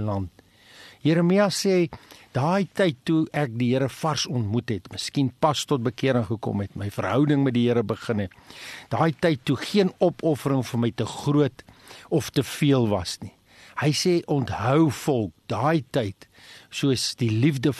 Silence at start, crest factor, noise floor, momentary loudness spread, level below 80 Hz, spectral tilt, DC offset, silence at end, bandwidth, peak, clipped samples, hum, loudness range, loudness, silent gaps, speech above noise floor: 0 s; 18 dB; -50 dBFS; 10 LU; -58 dBFS; -6 dB/octave; under 0.1%; 0 s; 13 kHz; -6 dBFS; under 0.1%; none; 2 LU; -24 LUFS; none; 26 dB